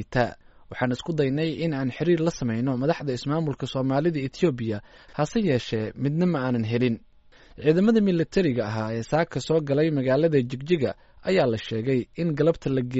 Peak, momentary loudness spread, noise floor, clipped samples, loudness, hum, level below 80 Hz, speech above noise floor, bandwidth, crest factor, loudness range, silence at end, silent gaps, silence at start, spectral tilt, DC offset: -8 dBFS; 7 LU; -52 dBFS; under 0.1%; -25 LUFS; none; -52 dBFS; 28 dB; 8 kHz; 16 dB; 3 LU; 0 s; none; 0 s; -6.5 dB/octave; under 0.1%